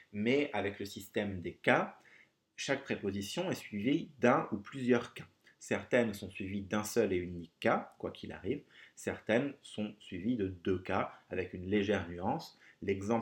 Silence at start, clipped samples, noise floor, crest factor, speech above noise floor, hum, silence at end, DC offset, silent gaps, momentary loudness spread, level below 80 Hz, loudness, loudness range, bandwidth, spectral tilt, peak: 0.15 s; under 0.1%; -65 dBFS; 24 dB; 30 dB; none; 0 s; under 0.1%; none; 12 LU; -70 dBFS; -35 LUFS; 3 LU; 17 kHz; -5.5 dB/octave; -10 dBFS